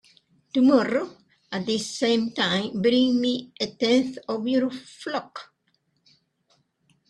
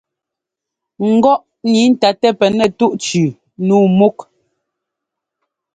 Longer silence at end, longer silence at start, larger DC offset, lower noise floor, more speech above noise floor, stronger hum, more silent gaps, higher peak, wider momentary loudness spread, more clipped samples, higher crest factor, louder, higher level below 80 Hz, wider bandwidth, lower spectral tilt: first, 1.65 s vs 1.5 s; second, 0.55 s vs 1 s; neither; second, -71 dBFS vs -82 dBFS; second, 47 dB vs 70 dB; neither; neither; second, -6 dBFS vs 0 dBFS; first, 12 LU vs 6 LU; neither; about the same, 20 dB vs 16 dB; second, -24 LUFS vs -14 LUFS; second, -68 dBFS vs -58 dBFS; first, 11 kHz vs 9.4 kHz; second, -4.5 dB/octave vs -6 dB/octave